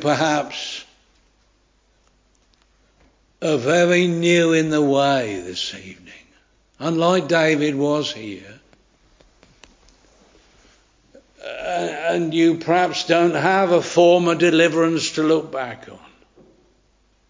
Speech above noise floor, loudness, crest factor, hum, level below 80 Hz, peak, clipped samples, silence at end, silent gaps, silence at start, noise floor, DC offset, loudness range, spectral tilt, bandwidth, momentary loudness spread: 42 dB; -18 LUFS; 20 dB; none; -60 dBFS; 0 dBFS; under 0.1%; 1.35 s; none; 0 s; -61 dBFS; under 0.1%; 12 LU; -5 dB/octave; 7.6 kHz; 15 LU